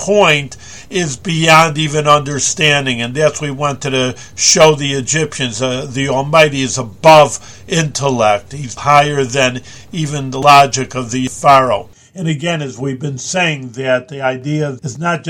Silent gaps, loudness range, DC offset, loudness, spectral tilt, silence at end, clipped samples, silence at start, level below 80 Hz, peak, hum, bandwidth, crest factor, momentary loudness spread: none; 3 LU; 1%; -13 LUFS; -3.5 dB/octave; 0 s; 1%; 0 s; -46 dBFS; 0 dBFS; none; over 20 kHz; 14 dB; 12 LU